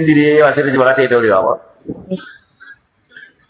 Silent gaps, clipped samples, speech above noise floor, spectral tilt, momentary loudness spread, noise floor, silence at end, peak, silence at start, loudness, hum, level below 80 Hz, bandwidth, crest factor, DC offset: none; under 0.1%; 31 dB; -10 dB/octave; 16 LU; -44 dBFS; 0.75 s; 0 dBFS; 0 s; -12 LUFS; none; -54 dBFS; 4 kHz; 14 dB; under 0.1%